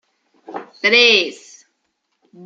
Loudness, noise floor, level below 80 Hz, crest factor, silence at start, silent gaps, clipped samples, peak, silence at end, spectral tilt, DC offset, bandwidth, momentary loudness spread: -13 LUFS; -71 dBFS; -72 dBFS; 18 dB; 0.5 s; none; under 0.1%; 0 dBFS; 0 s; -1.5 dB/octave; under 0.1%; 8 kHz; 23 LU